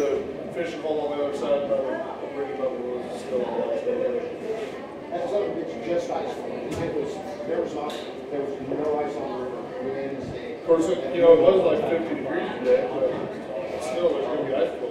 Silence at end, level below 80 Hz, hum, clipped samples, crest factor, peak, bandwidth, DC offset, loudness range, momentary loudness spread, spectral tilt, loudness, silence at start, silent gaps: 0 s; -60 dBFS; none; under 0.1%; 22 dB; -2 dBFS; 11 kHz; under 0.1%; 8 LU; 10 LU; -6 dB/octave; -26 LUFS; 0 s; none